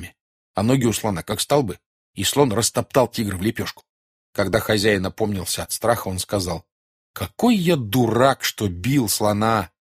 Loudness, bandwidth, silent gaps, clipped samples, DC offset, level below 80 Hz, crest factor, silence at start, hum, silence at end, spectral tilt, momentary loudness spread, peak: -21 LUFS; 15.5 kHz; 0.21-0.54 s, 1.86-2.14 s, 3.89-4.33 s, 6.72-7.14 s; under 0.1%; under 0.1%; -48 dBFS; 20 dB; 0 s; none; 0.2 s; -4.5 dB/octave; 13 LU; -2 dBFS